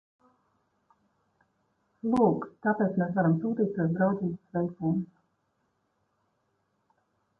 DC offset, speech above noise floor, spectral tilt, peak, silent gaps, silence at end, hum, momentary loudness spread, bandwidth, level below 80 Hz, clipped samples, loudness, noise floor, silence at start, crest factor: under 0.1%; 48 dB; -10.5 dB/octave; -12 dBFS; none; 2.35 s; none; 8 LU; 5.4 kHz; -66 dBFS; under 0.1%; -28 LUFS; -75 dBFS; 2.05 s; 20 dB